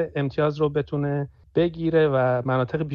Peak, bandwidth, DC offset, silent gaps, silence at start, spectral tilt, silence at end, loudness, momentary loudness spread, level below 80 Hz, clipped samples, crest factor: -8 dBFS; 6.4 kHz; under 0.1%; none; 0 s; -9.5 dB/octave; 0 s; -23 LUFS; 6 LU; -52 dBFS; under 0.1%; 16 dB